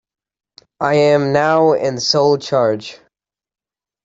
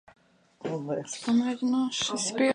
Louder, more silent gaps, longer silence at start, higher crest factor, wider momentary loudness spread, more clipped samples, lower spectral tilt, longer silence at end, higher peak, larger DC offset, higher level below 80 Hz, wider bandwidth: first, -15 LUFS vs -28 LUFS; neither; first, 0.8 s vs 0.6 s; about the same, 16 dB vs 16 dB; about the same, 8 LU vs 9 LU; neither; first, -5 dB/octave vs -3.5 dB/octave; first, 1.1 s vs 0 s; first, -2 dBFS vs -14 dBFS; neither; first, -60 dBFS vs -72 dBFS; second, 8 kHz vs 11 kHz